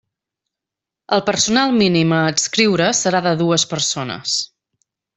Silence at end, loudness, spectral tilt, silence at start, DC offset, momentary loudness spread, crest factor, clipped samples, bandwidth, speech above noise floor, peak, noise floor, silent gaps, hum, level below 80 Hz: 0.7 s; -16 LUFS; -3.5 dB/octave; 1.1 s; under 0.1%; 6 LU; 16 dB; under 0.1%; 8.4 kHz; 69 dB; -2 dBFS; -85 dBFS; none; none; -56 dBFS